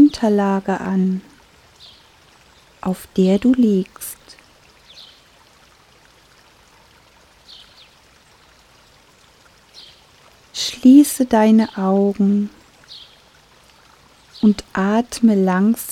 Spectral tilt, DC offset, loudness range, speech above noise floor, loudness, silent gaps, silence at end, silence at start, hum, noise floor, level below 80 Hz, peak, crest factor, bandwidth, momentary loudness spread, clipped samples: -6 dB/octave; under 0.1%; 8 LU; 36 dB; -16 LUFS; none; 0 s; 0 s; none; -51 dBFS; -54 dBFS; -2 dBFS; 18 dB; 15 kHz; 19 LU; under 0.1%